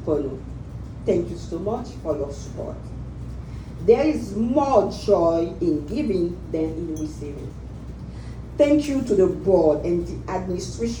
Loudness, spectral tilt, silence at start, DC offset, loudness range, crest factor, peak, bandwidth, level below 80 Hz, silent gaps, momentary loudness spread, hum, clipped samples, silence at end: -23 LUFS; -7 dB/octave; 0 s; under 0.1%; 6 LU; 20 dB; -2 dBFS; 17.5 kHz; -38 dBFS; none; 17 LU; none; under 0.1%; 0 s